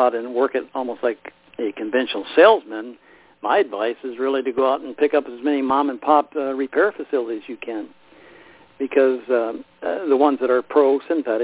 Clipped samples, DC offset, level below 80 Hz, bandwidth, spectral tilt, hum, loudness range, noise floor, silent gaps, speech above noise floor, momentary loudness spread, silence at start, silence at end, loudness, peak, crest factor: under 0.1%; under 0.1%; -66 dBFS; 4 kHz; -8 dB/octave; none; 3 LU; -48 dBFS; none; 28 dB; 13 LU; 0 s; 0 s; -20 LUFS; -2 dBFS; 20 dB